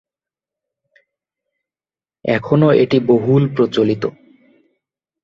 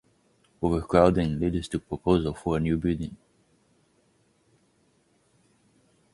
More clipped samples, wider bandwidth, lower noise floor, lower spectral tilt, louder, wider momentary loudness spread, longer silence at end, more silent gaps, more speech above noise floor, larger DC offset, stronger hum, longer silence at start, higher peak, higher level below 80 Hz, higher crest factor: neither; second, 7.2 kHz vs 11.5 kHz; first, under -90 dBFS vs -66 dBFS; about the same, -8.5 dB/octave vs -7.5 dB/octave; first, -15 LUFS vs -26 LUFS; about the same, 10 LU vs 11 LU; second, 1.15 s vs 3 s; neither; first, over 76 dB vs 42 dB; neither; neither; first, 2.25 s vs 0.6 s; about the same, -2 dBFS vs -4 dBFS; second, -56 dBFS vs -44 dBFS; second, 16 dB vs 24 dB